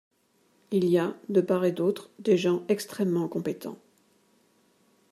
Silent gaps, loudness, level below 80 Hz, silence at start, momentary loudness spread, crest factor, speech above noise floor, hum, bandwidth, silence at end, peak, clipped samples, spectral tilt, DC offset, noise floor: none; -27 LUFS; -76 dBFS; 0.7 s; 8 LU; 18 dB; 41 dB; none; 14 kHz; 1.35 s; -10 dBFS; under 0.1%; -6.5 dB/octave; under 0.1%; -67 dBFS